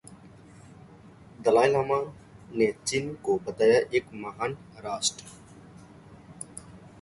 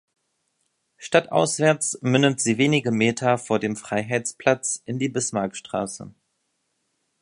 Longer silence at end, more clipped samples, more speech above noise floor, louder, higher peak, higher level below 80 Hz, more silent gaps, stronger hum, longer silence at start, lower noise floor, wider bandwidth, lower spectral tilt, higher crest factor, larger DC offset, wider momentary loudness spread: second, 0.15 s vs 1.1 s; neither; second, 25 dB vs 51 dB; second, -26 LUFS vs -22 LUFS; second, -6 dBFS vs -2 dBFS; about the same, -62 dBFS vs -64 dBFS; neither; neither; second, 0.05 s vs 1 s; second, -51 dBFS vs -74 dBFS; about the same, 11.5 kHz vs 11.5 kHz; about the same, -4 dB/octave vs -4.5 dB/octave; about the same, 22 dB vs 22 dB; neither; first, 19 LU vs 9 LU